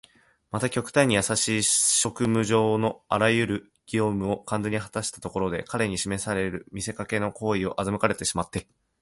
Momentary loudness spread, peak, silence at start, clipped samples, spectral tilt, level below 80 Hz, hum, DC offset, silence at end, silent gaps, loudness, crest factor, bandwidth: 10 LU; -6 dBFS; 0.55 s; under 0.1%; -3.5 dB/octave; -52 dBFS; none; under 0.1%; 0.4 s; none; -25 LUFS; 20 dB; 12 kHz